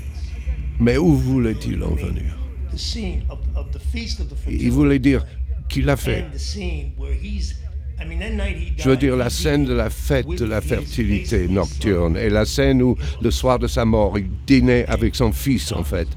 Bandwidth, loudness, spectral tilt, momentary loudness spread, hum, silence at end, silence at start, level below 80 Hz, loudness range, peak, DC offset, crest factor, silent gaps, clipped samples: 16 kHz; -21 LUFS; -6.5 dB/octave; 11 LU; none; 0 s; 0 s; -26 dBFS; 6 LU; -4 dBFS; under 0.1%; 16 dB; none; under 0.1%